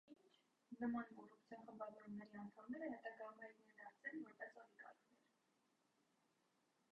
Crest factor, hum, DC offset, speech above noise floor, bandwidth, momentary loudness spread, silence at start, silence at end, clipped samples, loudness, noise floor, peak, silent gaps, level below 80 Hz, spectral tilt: 20 dB; none; under 0.1%; 31 dB; 8 kHz; 16 LU; 0.05 s; 1.8 s; under 0.1%; -54 LUFS; -84 dBFS; -36 dBFS; none; under -90 dBFS; -5.5 dB/octave